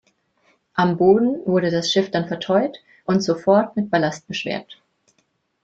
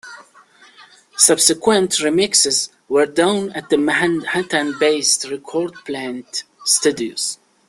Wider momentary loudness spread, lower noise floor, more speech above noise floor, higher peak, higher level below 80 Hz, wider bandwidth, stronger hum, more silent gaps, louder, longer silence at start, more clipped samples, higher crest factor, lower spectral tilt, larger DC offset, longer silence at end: about the same, 12 LU vs 12 LU; first, -68 dBFS vs -49 dBFS; first, 49 dB vs 31 dB; about the same, -2 dBFS vs 0 dBFS; about the same, -60 dBFS vs -60 dBFS; second, 7.8 kHz vs 13.5 kHz; neither; neither; second, -20 LUFS vs -17 LUFS; first, 0.75 s vs 0.05 s; neither; about the same, 18 dB vs 18 dB; first, -5.5 dB/octave vs -2 dB/octave; neither; first, 0.9 s vs 0.35 s